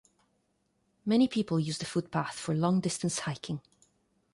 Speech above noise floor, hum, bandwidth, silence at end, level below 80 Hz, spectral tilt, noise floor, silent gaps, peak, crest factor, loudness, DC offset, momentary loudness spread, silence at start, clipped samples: 45 dB; none; 11.5 kHz; 0.75 s; -68 dBFS; -5.5 dB/octave; -75 dBFS; none; -14 dBFS; 18 dB; -31 LUFS; under 0.1%; 12 LU; 1.05 s; under 0.1%